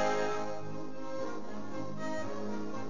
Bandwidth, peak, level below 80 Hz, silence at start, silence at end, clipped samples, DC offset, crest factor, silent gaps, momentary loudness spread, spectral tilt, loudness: 7.4 kHz; -18 dBFS; -70 dBFS; 0 s; 0 s; under 0.1%; 2%; 18 dB; none; 9 LU; -5 dB/octave; -39 LUFS